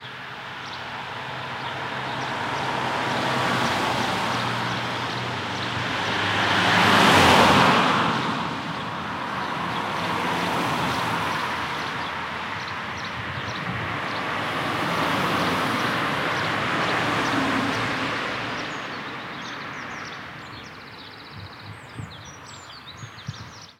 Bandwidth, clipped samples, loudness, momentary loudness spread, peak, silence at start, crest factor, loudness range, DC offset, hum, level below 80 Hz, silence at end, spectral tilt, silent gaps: 16 kHz; under 0.1%; -23 LUFS; 19 LU; -2 dBFS; 0 s; 24 dB; 16 LU; under 0.1%; none; -54 dBFS; 0.1 s; -4 dB/octave; none